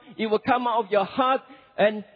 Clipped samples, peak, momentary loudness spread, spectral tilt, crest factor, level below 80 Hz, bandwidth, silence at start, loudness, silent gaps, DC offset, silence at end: under 0.1%; -8 dBFS; 4 LU; -8 dB/octave; 16 dB; -66 dBFS; 5 kHz; 0.05 s; -24 LUFS; none; under 0.1%; 0.15 s